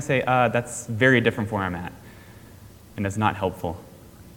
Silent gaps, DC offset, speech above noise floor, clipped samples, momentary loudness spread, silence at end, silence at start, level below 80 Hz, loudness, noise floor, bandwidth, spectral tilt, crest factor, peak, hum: none; under 0.1%; 23 dB; under 0.1%; 16 LU; 0 s; 0 s; -52 dBFS; -23 LUFS; -46 dBFS; 19 kHz; -5.5 dB/octave; 22 dB; -4 dBFS; none